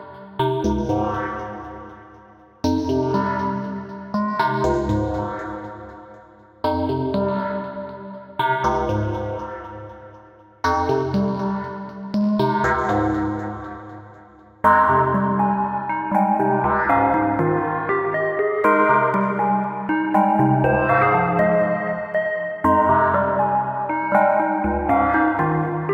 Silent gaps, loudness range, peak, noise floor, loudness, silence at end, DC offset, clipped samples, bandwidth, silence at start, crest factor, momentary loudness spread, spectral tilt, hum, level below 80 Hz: none; 7 LU; -4 dBFS; -47 dBFS; -20 LUFS; 0 s; under 0.1%; under 0.1%; 15.5 kHz; 0 s; 18 dB; 16 LU; -7.5 dB/octave; none; -42 dBFS